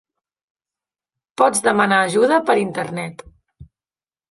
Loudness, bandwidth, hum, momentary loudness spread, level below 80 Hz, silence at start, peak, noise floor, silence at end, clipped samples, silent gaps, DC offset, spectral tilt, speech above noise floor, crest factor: -17 LUFS; 11.5 kHz; none; 13 LU; -58 dBFS; 1.4 s; -2 dBFS; under -90 dBFS; 0.65 s; under 0.1%; none; under 0.1%; -4 dB/octave; over 73 dB; 18 dB